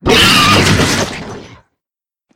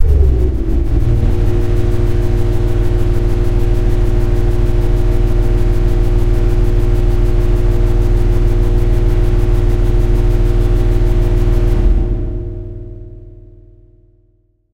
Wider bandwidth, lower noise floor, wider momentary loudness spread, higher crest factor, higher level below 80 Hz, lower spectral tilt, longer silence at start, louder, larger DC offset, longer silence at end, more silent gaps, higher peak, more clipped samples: first, 17 kHz vs 6.6 kHz; first, -87 dBFS vs -55 dBFS; first, 19 LU vs 2 LU; about the same, 12 dB vs 12 dB; second, -32 dBFS vs -14 dBFS; second, -3.5 dB/octave vs -8.5 dB/octave; about the same, 0.05 s vs 0 s; first, -9 LUFS vs -16 LUFS; second, under 0.1% vs 3%; first, 0.9 s vs 0 s; neither; about the same, 0 dBFS vs 0 dBFS; first, 0.1% vs under 0.1%